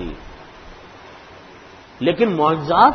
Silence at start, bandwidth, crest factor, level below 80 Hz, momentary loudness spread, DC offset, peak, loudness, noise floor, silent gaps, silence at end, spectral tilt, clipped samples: 0 s; 6.6 kHz; 20 dB; -44 dBFS; 24 LU; under 0.1%; 0 dBFS; -18 LUFS; -42 dBFS; none; 0 s; -7.5 dB/octave; under 0.1%